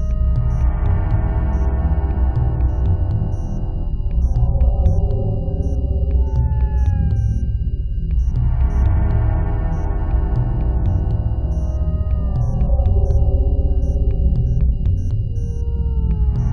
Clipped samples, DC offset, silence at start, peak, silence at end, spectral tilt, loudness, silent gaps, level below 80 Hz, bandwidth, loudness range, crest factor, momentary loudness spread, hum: under 0.1%; 0.3%; 0 s; -4 dBFS; 0 s; -10 dB/octave; -20 LUFS; none; -18 dBFS; 3 kHz; 1 LU; 14 dB; 5 LU; none